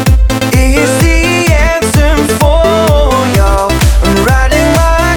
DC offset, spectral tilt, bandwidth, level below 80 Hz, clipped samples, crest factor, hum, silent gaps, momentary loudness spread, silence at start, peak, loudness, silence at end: under 0.1%; -5 dB/octave; 19 kHz; -12 dBFS; under 0.1%; 8 dB; none; none; 1 LU; 0 s; 0 dBFS; -9 LUFS; 0 s